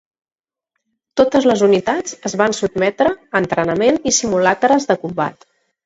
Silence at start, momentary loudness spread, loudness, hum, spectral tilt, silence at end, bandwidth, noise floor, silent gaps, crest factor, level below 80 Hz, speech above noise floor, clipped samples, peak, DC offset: 1.15 s; 8 LU; -16 LUFS; none; -4 dB/octave; 0.55 s; 8.2 kHz; under -90 dBFS; none; 16 dB; -52 dBFS; over 74 dB; under 0.1%; 0 dBFS; under 0.1%